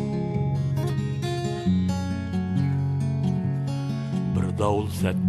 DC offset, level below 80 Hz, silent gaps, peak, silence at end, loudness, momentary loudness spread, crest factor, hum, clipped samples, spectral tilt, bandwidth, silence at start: under 0.1%; -48 dBFS; none; -10 dBFS; 0 s; -26 LUFS; 4 LU; 14 dB; none; under 0.1%; -7.5 dB/octave; 13 kHz; 0 s